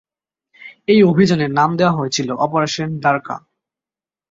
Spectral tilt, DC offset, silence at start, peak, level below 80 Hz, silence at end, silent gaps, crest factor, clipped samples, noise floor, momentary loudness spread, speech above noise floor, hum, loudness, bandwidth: -5.5 dB/octave; under 0.1%; 0.6 s; -2 dBFS; -56 dBFS; 0.95 s; none; 16 dB; under 0.1%; under -90 dBFS; 11 LU; over 75 dB; none; -16 LUFS; 7.8 kHz